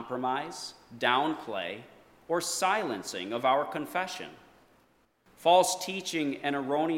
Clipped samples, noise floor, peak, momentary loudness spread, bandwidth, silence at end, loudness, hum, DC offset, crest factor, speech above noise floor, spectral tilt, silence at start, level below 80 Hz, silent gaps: under 0.1%; -67 dBFS; -10 dBFS; 15 LU; 17 kHz; 0 s; -29 LUFS; none; under 0.1%; 20 dB; 37 dB; -3 dB/octave; 0 s; -74 dBFS; none